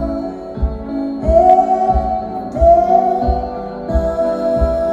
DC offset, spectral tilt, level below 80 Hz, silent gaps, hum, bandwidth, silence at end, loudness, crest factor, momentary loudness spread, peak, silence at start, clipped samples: under 0.1%; -9 dB/octave; -24 dBFS; none; none; 7.8 kHz; 0 s; -15 LUFS; 14 dB; 13 LU; 0 dBFS; 0 s; under 0.1%